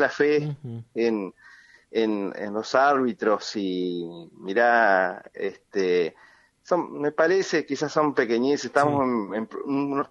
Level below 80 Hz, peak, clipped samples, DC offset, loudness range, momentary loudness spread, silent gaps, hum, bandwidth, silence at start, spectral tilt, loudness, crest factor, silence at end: -72 dBFS; -4 dBFS; under 0.1%; under 0.1%; 2 LU; 12 LU; none; none; 10 kHz; 0 s; -5.5 dB/octave; -24 LUFS; 20 dB; 0.05 s